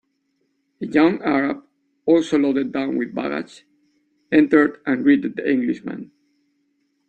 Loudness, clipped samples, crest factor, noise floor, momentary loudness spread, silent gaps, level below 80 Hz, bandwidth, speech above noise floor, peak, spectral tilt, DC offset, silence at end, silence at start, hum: -20 LUFS; under 0.1%; 18 dB; -70 dBFS; 14 LU; none; -62 dBFS; 8.6 kHz; 51 dB; -4 dBFS; -6.5 dB/octave; under 0.1%; 1.05 s; 0.8 s; none